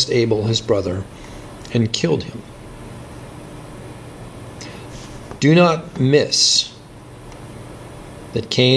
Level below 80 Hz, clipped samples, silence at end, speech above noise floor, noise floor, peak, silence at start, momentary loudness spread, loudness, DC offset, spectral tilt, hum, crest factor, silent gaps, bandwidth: -46 dBFS; under 0.1%; 0 s; 22 dB; -39 dBFS; 0 dBFS; 0 s; 23 LU; -17 LUFS; under 0.1%; -4.5 dB/octave; none; 20 dB; none; 11 kHz